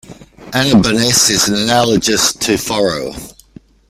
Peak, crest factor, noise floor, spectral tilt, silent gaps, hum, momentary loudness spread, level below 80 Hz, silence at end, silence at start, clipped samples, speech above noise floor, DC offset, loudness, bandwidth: 0 dBFS; 14 dB; -42 dBFS; -3 dB/octave; none; none; 11 LU; -42 dBFS; 0.6 s; 0.1 s; under 0.1%; 28 dB; under 0.1%; -12 LUFS; 16 kHz